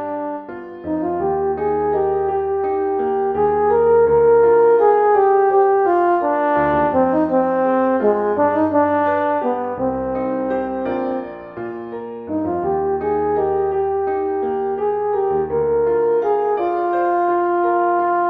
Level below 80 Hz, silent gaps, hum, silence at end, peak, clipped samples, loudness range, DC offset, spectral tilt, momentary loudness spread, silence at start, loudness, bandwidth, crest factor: -48 dBFS; none; none; 0 s; -4 dBFS; under 0.1%; 8 LU; under 0.1%; -9.5 dB/octave; 10 LU; 0 s; -18 LUFS; 4 kHz; 14 dB